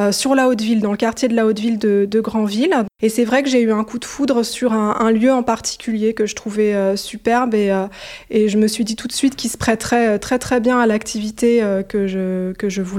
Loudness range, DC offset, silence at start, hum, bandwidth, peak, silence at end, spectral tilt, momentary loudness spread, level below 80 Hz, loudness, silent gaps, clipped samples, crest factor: 1 LU; under 0.1%; 0 s; none; 15.5 kHz; -2 dBFS; 0 s; -4.5 dB/octave; 6 LU; -48 dBFS; -17 LUFS; none; under 0.1%; 16 dB